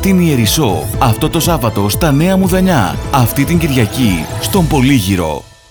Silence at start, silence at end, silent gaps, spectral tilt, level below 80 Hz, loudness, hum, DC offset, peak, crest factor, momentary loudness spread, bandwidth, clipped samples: 0 s; 0.25 s; none; -5.5 dB/octave; -26 dBFS; -12 LUFS; none; under 0.1%; 0 dBFS; 12 dB; 4 LU; over 20 kHz; under 0.1%